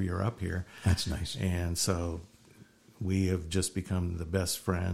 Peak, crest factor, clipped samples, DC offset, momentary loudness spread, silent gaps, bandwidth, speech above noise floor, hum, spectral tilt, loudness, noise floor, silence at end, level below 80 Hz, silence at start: -14 dBFS; 18 dB; under 0.1%; under 0.1%; 7 LU; none; 15.5 kHz; 27 dB; none; -5 dB/octave; -32 LUFS; -58 dBFS; 0 s; -46 dBFS; 0 s